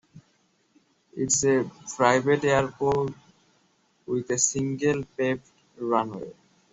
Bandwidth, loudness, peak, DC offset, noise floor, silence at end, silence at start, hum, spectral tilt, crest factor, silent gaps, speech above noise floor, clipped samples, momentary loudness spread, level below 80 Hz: 8.2 kHz; -25 LUFS; -4 dBFS; under 0.1%; -67 dBFS; 0.4 s; 0.15 s; none; -4 dB/octave; 22 dB; none; 42 dB; under 0.1%; 13 LU; -60 dBFS